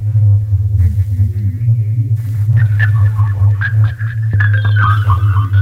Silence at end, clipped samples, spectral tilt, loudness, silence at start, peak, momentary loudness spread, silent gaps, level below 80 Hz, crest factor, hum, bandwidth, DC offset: 0 s; under 0.1%; -8 dB/octave; -13 LUFS; 0 s; -2 dBFS; 4 LU; none; -30 dBFS; 10 dB; none; 3.9 kHz; under 0.1%